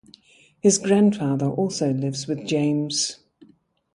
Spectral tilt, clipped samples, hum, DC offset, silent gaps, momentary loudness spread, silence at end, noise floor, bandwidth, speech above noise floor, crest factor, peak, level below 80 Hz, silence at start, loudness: -5 dB/octave; under 0.1%; none; under 0.1%; none; 8 LU; 0.8 s; -58 dBFS; 11.5 kHz; 37 dB; 18 dB; -4 dBFS; -64 dBFS; 0.65 s; -22 LUFS